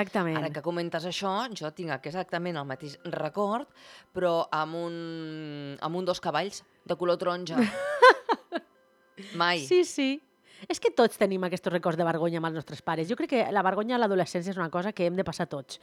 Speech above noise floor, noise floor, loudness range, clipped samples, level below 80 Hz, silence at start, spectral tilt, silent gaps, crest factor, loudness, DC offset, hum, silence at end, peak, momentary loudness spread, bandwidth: 35 dB; -63 dBFS; 7 LU; under 0.1%; -70 dBFS; 0 s; -5 dB/octave; none; 24 dB; -28 LUFS; under 0.1%; none; 0.05 s; -4 dBFS; 13 LU; 15 kHz